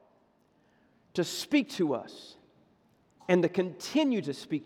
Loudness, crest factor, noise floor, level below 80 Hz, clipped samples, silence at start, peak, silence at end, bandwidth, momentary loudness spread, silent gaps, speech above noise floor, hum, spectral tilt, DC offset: -30 LUFS; 22 dB; -67 dBFS; -78 dBFS; under 0.1%; 1.15 s; -10 dBFS; 0 s; 16.5 kHz; 18 LU; none; 38 dB; none; -5 dB/octave; under 0.1%